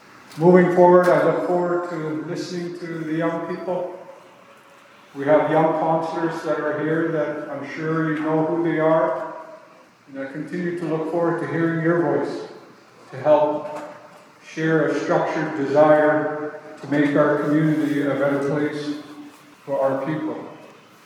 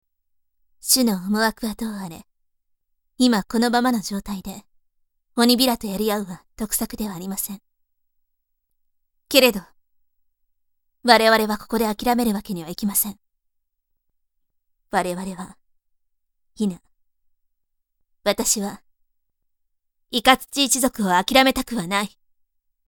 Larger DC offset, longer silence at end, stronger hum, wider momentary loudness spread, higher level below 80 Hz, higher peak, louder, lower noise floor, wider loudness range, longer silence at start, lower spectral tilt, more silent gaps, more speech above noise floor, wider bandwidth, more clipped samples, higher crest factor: neither; second, 0.35 s vs 0.8 s; neither; about the same, 18 LU vs 16 LU; second, -80 dBFS vs -50 dBFS; about the same, -2 dBFS vs 0 dBFS; about the same, -21 LUFS vs -20 LUFS; second, -49 dBFS vs -73 dBFS; second, 5 LU vs 10 LU; second, 0.3 s vs 0.85 s; first, -7.5 dB/octave vs -3 dB/octave; neither; second, 29 dB vs 52 dB; second, 12.5 kHz vs over 20 kHz; neither; about the same, 20 dB vs 24 dB